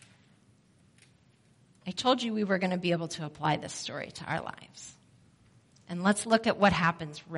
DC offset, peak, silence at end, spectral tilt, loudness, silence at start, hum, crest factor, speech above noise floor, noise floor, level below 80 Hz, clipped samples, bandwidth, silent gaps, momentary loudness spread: under 0.1%; -10 dBFS; 0 s; -4.5 dB/octave; -30 LUFS; 1.85 s; none; 22 dB; 34 dB; -64 dBFS; -62 dBFS; under 0.1%; 11.5 kHz; none; 18 LU